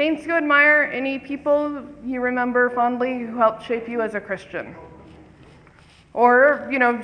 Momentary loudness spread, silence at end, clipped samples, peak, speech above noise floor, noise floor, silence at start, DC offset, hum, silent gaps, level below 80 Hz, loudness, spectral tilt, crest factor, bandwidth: 15 LU; 0 s; under 0.1%; -4 dBFS; 30 dB; -50 dBFS; 0 s; under 0.1%; none; none; -58 dBFS; -20 LUFS; -6 dB/octave; 18 dB; 9.8 kHz